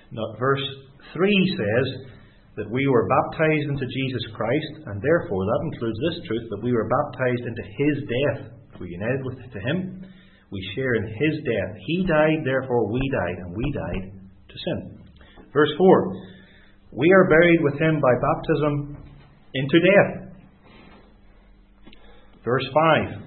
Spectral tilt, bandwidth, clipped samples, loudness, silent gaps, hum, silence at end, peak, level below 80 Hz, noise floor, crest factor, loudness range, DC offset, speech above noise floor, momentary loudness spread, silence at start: -11.5 dB/octave; 4.4 kHz; under 0.1%; -22 LUFS; none; none; 0 s; -2 dBFS; -48 dBFS; -52 dBFS; 20 dB; 7 LU; under 0.1%; 30 dB; 18 LU; 0.1 s